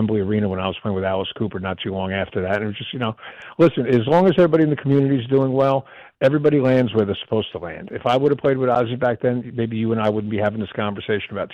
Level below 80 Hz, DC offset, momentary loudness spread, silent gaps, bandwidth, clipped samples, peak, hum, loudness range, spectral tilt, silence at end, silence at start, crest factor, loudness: -54 dBFS; under 0.1%; 10 LU; none; 8 kHz; under 0.1%; -6 dBFS; none; 5 LU; -8.5 dB/octave; 0 s; 0 s; 12 dB; -20 LUFS